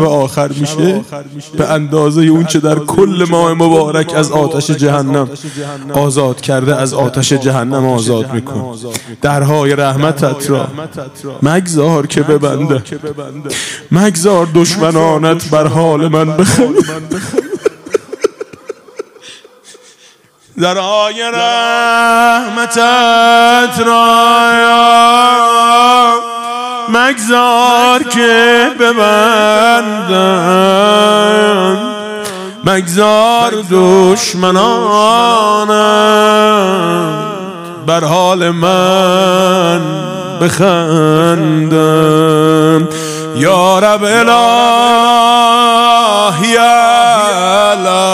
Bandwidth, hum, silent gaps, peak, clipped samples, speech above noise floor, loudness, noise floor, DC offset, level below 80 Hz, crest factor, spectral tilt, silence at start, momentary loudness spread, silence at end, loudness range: 16.5 kHz; none; none; 0 dBFS; 0.4%; 36 dB; -9 LUFS; -45 dBFS; under 0.1%; -50 dBFS; 10 dB; -4.5 dB/octave; 0 s; 12 LU; 0 s; 6 LU